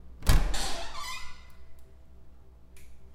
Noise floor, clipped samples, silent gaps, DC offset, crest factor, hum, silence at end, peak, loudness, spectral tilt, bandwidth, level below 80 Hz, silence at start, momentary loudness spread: -49 dBFS; under 0.1%; none; under 0.1%; 22 dB; none; 0 s; -6 dBFS; -32 LUFS; -3.5 dB/octave; 16 kHz; -32 dBFS; 0.05 s; 27 LU